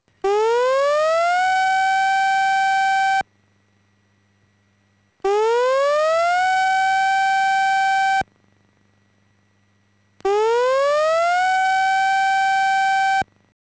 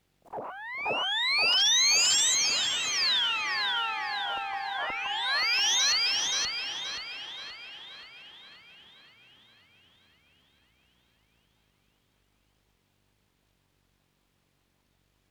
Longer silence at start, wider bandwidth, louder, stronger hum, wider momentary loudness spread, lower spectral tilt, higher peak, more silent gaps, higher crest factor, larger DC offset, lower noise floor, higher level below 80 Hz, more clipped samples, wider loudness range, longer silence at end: about the same, 0.25 s vs 0.3 s; second, 8 kHz vs over 20 kHz; first, -18 LUFS vs -25 LUFS; neither; second, 5 LU vs 21 LU; first, -1.5 dB/octave vs 2.5 dB/octave; about the same, -12 dBFS vs -14 dBFS; neither; second, 8 dB vs 18 dB; neither; second, -62 dBFS vs -72 dBFS; first, -62 dBFS vs -72 dBFS; neither; second, 5 LU vs 17 LU; second, 0.4 s vs 6.6 s